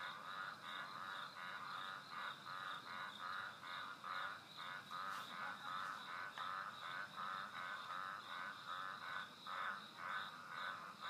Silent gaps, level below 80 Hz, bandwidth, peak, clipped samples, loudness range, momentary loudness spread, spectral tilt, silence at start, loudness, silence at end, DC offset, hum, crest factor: none; under -90 dBFS; 15.5 kHz; -32 dBFS; under 0.1%; 1 LU; 3 LU; -2 dB/octave; 0 s; -48 LUFS; 0 s; under 0.1%; none; 16 dB